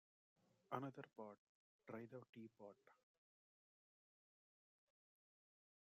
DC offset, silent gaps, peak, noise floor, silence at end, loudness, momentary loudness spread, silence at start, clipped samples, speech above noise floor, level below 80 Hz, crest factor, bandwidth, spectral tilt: under 0.1%; 1.38-1.79 s, 2.29-2.33 s; -30 dBFS; under -90 dBFS; 2.95 s; -56 LUFS; 13 LU; 0.7 s; under 0.1%; over 34 dB; under -90 dBFS; 30 dB; 7 kHz; -6 dB/octave